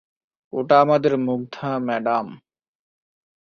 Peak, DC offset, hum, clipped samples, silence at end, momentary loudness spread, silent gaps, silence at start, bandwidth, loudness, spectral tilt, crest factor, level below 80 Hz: -2 dBFS; under 0.1%; none; under 0.1%; 1.1 s; 14 LU; none; 0.55 s; 6.8 kHz; -20 LUFS; -7.5 dB/octave; 20 dB; -66 dBFS